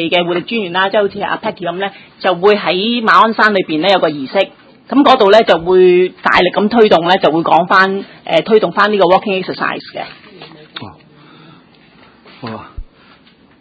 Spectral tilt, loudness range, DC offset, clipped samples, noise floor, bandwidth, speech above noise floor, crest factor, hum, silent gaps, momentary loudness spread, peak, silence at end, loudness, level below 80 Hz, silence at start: -6 dB/octave; 9 LU; under 0.1%; 0.3%; -46 dBFS; 8 kHz; 34 dB; 14 dB; none; none; 18 LU; 0 dBFS; 0.75 s; -12 LUFS; -46 dBFS; 0 s